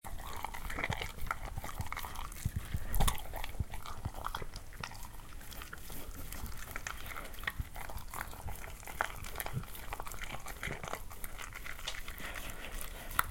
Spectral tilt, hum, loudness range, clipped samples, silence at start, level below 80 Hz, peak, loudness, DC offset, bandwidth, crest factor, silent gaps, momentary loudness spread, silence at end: -3.5 dB/octave; none; 5 LU; under 0.1%; 0.05 s; -44 dBFS; -6 dBFS; -42 LUFS; under 0.1%; 17 kHz; 32 dB; none; 9 LU; 0 s